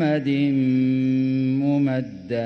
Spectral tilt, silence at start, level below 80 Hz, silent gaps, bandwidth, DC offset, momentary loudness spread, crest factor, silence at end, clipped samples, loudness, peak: -9 dB/octave; 0 s; -60 dBFS; none; 6 kHz; under 0.1%; 4 LU; 10 dB; 0 s; under 0.1%; -21 LUFS; -10 dBFS